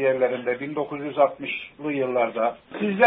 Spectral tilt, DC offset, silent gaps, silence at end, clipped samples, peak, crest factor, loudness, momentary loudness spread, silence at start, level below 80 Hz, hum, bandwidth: -10 dB/octave; under 0.1%; none; 0 s; under 0.1%; -4 dBFS; 20 dB; -25 LUFS; 7 LU; 0 s; -66 dBFS; none; 4 kHz